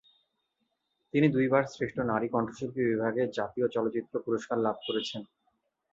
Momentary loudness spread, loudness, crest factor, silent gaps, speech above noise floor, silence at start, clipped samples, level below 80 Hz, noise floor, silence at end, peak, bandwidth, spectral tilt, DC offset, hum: 7 LU; -30 LUFS; 22 dB; none; 50 dB; 1.15 s; under 0.1%; -66 dBFS; -80 dBFS; 0.7 s; -10 dBFS; 7.8 kHz; -6.5 dB/octave; under 0.1%; none